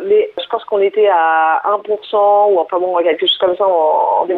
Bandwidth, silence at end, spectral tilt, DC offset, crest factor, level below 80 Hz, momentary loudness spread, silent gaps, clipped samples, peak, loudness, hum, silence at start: 4.3 kHz; 0 s; -5.5 dB/octave; under 0.1%; 10 dB; -64 dBFS; 6 LU; none; under 0.1%; -2 dBFS; -14 LUFS; none; 0 s